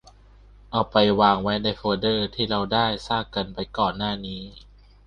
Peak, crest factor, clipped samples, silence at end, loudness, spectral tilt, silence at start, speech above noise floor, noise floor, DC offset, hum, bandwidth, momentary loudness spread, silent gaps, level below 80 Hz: -4 dBFS; 22 dB; under 0.1%; 0.5 s; -23 LUFS; -6.5 dB/octave; 0.7 s; 27 dB; -50 dBFS; under 0.1%; 50 Hz at -45 dBFS; 9.6 kHz; 11 LU; none; -46 dBFS